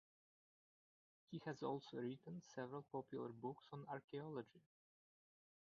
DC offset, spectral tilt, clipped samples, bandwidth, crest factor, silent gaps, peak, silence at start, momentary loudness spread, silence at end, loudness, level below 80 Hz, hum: under 0.1%; -6 dB/octave; under 0.1%; 7 kHz; 20 dB; 4.04-4.08 s; -34 dBFS; 1.3 s; 7 LU; 1.1 s; -52 LUFS; under -90 dBFS; none